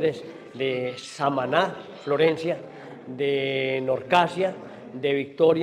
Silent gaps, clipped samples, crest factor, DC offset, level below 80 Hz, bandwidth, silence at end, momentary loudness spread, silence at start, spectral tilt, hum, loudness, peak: none; under 0.1%; 20 dB; under 0.1%; -70 dBFS; 11 kHz; 0 s; 17 LU; 0 s; -5.5 dB/octave; none; -25 LUFS; -6 dBFS